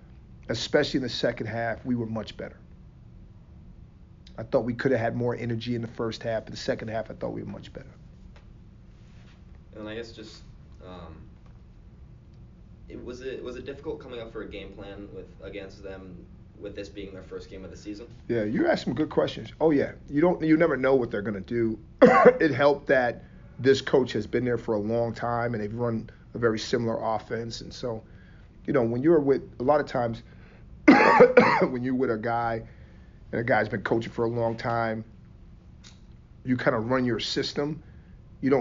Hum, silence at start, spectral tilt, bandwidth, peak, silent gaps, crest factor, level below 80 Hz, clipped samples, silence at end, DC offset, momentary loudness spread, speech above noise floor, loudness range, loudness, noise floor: none; 0.1 s; -5 dB/octave; 7.4 kHz; -4 dBFS; none; 22 dB; -50 dBFS; under 0.1%; 0 s; under 0.1%; 20 LU; 24 dB; 20 LU; -25 LUFS; -49 dBFS